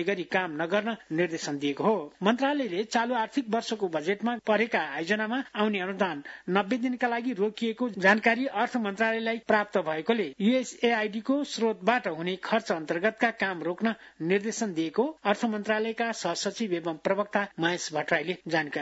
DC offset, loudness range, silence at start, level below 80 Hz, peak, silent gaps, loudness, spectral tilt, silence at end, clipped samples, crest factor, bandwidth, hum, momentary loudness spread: under 0.1%; 3 LU; 0 s; -74 dBFS; -8 dBFS; none; -28 LUFS; -4.5 dB/octave; 0 s; under 0.1%; 20 dB; 8 kHz; none; 5 LU